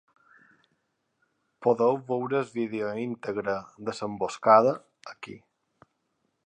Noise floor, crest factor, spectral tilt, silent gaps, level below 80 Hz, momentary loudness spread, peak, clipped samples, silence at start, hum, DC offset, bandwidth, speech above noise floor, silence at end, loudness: -76 dBFS; 24 dB; -6 dB/octave; none; -72 dBFS; 22 LU; -4 dBFS; under 0.1%; 1.6 s; none; under 0.1%; 9.6 kHz; 50 dB; 1.1 s; -27 LUFS